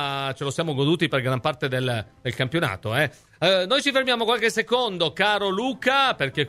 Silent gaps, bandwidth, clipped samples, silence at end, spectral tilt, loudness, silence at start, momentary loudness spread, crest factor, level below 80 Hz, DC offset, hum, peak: none; 15 kHz; under 0.1%; 0 s; -4.5 dB/octave; -23 LUFS; 0 s; 7 LU; 18 dB; -58 dBFS; under 0.1%; none; -6 dBFS